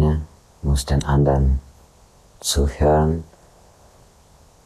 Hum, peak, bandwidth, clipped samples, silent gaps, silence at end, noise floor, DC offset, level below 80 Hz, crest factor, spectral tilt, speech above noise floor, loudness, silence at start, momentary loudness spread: none; -6 dBFS; 14 kHz; under 0.1%; none; 1.45 s; -51 dBFS; under 0.1%; -26 dBFS; 16 dB; -6 dB/octave; 34 dB; -20 LUFS; 0 s; 11 LU